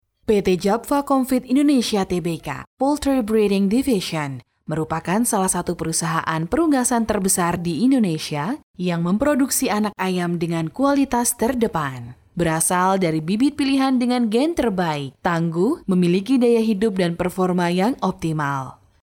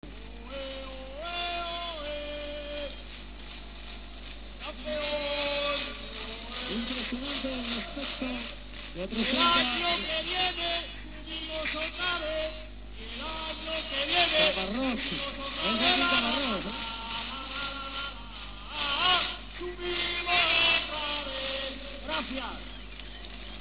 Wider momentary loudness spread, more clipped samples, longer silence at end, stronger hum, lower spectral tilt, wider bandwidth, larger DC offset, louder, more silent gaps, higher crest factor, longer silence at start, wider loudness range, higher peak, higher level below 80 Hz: second, 7 LU vs 19 LU; neither; first, 0.3 s vs 0 s; second, none vs 50 Hz at -45 dBFS; first, -5 dB/octave vs -0.5 dB/octave; first, 18.5 kHz vs 4 kHz; second, under 0.1% vs 0.3%; first, -20 LUFS vs -29 LUFS; first, 2.67-2.77 s, 8.63-8.74 s vs none; second, 16 dB vs 22 dB; first, 0.3 s vs 0 s; second, 2 LU vs 10 LU; first, -4 dBFS vs -10 dBFS; about the same, -48 dBFS vs -46 dBFS